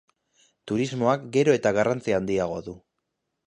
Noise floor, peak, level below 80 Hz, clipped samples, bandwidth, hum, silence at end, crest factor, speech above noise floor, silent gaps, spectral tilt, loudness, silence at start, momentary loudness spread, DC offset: -80 dBFS; -8 dBFS; -58 dBFS; under 0.1%; 11 kHz; none; 0.7 s; 18 dB; 56 dB; none; -6 dB/octave; -24 LUFS; 0.65 s; 10 LU; under 0.1%